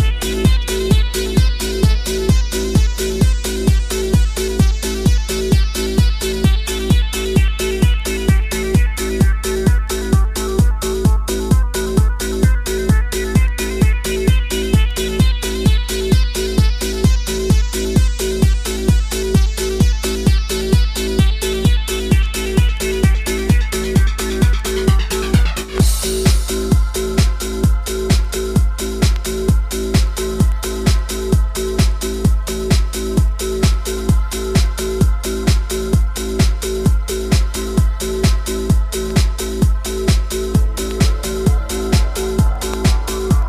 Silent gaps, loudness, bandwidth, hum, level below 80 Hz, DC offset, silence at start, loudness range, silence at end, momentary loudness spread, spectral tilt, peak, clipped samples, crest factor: none; -17 LUFS; 15.5 kHz; none; -18 dBFS; under 0.1%; 0 s; 1 LU; 0 s; 2 LU; -5.5 dB/octave; 0 dBFS; under 0.1%; 14 dB